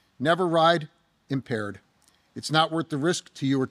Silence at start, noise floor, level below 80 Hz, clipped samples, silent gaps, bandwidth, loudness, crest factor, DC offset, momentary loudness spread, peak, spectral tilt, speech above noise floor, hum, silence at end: 0.2 s; -64 dBFS; -72 dBFS; under 0.1%; none; 14.5 kHz; -25 LUFS; 18 dB; under 0.1%; 16 LU; -8 dBFS; -5 dB/octave; 39 dB; none; 0.05 s